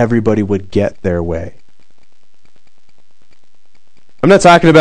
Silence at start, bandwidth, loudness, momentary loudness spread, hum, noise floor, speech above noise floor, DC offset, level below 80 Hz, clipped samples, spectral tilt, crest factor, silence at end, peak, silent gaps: 0 s; 12 kHz; -12 LUFS; 15 LU; none; -59 dBFS; 49 dB; 4%; -42 dBFS; 2%; -6 dB/octave; 14 dB; 0 s; 0 dBFS; none